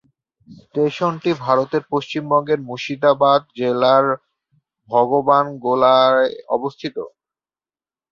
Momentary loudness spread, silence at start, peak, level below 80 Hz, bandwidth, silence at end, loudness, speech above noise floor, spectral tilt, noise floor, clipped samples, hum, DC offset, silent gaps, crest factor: 13 LU; 0.5 s; -2 dBFS; -64 dBFS; 7.2 kHz; 1.05 s; -18 LUFS; over 73 dB; -6.5 dB/octave; under -90 dBFS; under 0.1%; none; under 0.1%; none; 18 dB